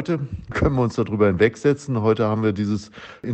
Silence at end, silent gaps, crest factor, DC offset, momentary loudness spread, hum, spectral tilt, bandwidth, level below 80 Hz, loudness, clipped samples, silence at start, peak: 0 s; none; 16 dB; under 0.1%; 10 LU; none; -7.5 dB/octave; 8.6 kHz; -40 dBFS; -21 LUFS; under 0.1%; 0 s; -4 dBFS